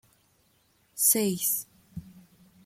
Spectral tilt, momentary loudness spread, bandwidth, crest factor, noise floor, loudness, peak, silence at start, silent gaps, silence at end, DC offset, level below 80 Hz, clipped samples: -3 dB/octave; 24 LU; 16.5 kHz; 22 dB; -67 dBFS; -24 LUFS; -10 dBFS; 0.95 s; none; 0.45 s; under 0.1%; -66 dBFS; under 0.1%